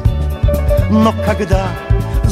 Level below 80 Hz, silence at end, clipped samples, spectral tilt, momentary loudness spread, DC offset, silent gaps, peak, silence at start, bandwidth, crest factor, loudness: -18 dBFS; 0 s; under 0.1%; -7.5 dB/octave; 5 LU; under 0.1%; none; 0 dBFS; 0 s; 15.5 kHz; 14 dB; -15 LUFS